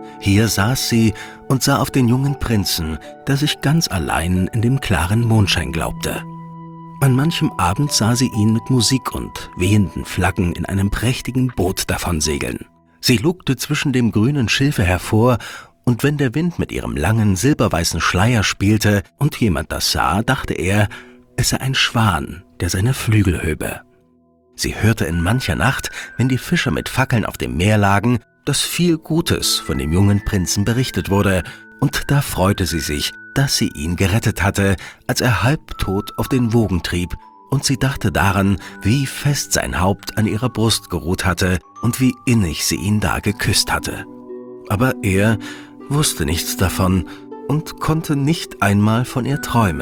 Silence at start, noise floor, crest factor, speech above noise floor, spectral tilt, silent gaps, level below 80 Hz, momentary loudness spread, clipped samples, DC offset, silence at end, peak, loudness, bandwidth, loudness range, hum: 0 s; -55 dBFS; 16 dB; 38 dB; -5 dB/octave; none; -36 dBFS; 8 LU; under 0.1%; under 0.1%; 0 s; -2 dBFS; -18 LUFS; 19.5 kHz; 2 LU; none